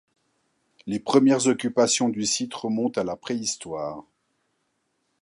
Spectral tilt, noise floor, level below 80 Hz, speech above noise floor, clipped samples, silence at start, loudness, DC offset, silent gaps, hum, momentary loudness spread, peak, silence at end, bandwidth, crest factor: -3.5 dB/octave; -74 dBFS; -66 dBFS; 50 dB; under 0.1%; 0.85 s; -24 LUFS; under 0.1%; none; none; 13 LU; -4 dBFS; 1.2 s; 11.5 kHz; 22 dB